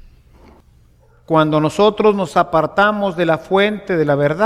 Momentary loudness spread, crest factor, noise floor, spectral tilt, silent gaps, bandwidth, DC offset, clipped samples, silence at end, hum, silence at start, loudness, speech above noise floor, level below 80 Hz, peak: 4 LU; 16 dB; -50 dBFS; -6.5 dB/octave; none; 14 kHz; under 0.1%; under 0.1%; 0 s; none; 1.3 s; -16 LUFS; 35 dB; -48 dBFS; -2 dBFS